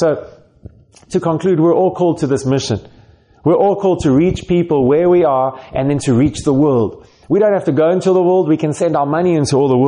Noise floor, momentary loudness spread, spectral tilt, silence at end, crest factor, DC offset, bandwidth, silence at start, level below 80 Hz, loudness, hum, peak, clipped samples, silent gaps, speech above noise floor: -40 dBFS; 7 LU; -7 dB/octave; 0 s; 10 dB; under 0.1%; 11 kHz; 0 s; -42 dBFS; -14 LUFS; none; -4 dBFS; under 0.1%; none; 27 dB